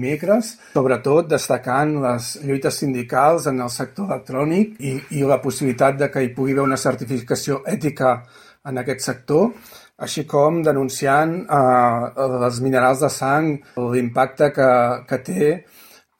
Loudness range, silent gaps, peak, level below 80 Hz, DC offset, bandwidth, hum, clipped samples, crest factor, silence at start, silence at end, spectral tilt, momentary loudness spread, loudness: 4 LU; none; -4 dBFS; -58 dBFS; under 0.1%; 17 kHz; none; under 0.1%; 16 dB; 0 s; 0.6 s; -5.5 dB/octave; 9 LU; -19 LUFS